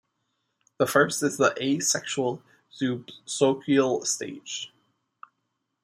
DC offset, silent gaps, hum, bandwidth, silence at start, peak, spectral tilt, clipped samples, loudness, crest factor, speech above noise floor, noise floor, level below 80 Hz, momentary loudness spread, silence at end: under 0.1%; none; none; 15.5 kHz; 0.8 s; -6 dBFS; -3.5 dB/octave; under 0.1%; -25 LUFS; 22 dB; 53 dB; -79 dBFS; -74 dBFS; 13 LU; 1.15 s